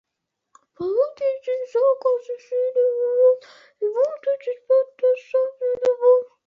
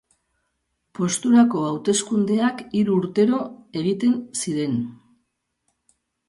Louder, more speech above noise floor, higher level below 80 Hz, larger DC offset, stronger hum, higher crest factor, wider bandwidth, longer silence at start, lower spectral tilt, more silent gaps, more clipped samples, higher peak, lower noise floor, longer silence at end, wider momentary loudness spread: about the same, -21 LUFS vs -21 LUFS; first, 60 dB vs 54 dB; second, -74 dBFS vs -66 dBFS; neither; neither; about the same, 14 dB vs 16 dB; second, 6.2 kHz vs 11.5 kHz; second, 0.8 s vs 1 s; about the same, -5.5 dB/octave vs -5 dB/octave; neither; neither; about the same, -6 dBFS vs -6 dBFS; first, -80 dBFS vs -74 dBFS; second, 0.2 s vs 1.35 s; about the same, 9 LU vs 10 LU